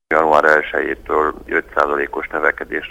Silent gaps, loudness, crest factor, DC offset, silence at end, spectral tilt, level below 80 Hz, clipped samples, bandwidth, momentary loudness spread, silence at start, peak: none; -17 LUFS; 16 dB; under 0.1%; 0 s; -5 dB/octave; -44 dBFS; under 0.1%; 15.5 kHz; 9 LU; 0.1 s; 0 dBFS